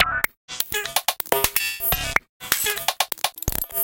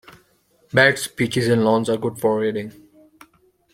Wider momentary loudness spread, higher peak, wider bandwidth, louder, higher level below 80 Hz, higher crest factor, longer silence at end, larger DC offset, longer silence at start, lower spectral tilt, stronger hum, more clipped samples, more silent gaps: second, 5 LU vs 9 LU; about the same, 0 dBFS vs -2 dBFS; about the same, 18 kHz vs 16.5 kHz; second, -22 LUFS vs -19 LUFS; first, -40 dBFS vs -58 dBFS; about the same, 24 dB vs 20 dB; second, 0 s vs 1.05 s; neither; second, 0 s vs 0.75 s; second, -1 dB/octave vs -5 dB/octave; neither; neither; first, 0.37-0.48 s, 2.29-2.40 s vs none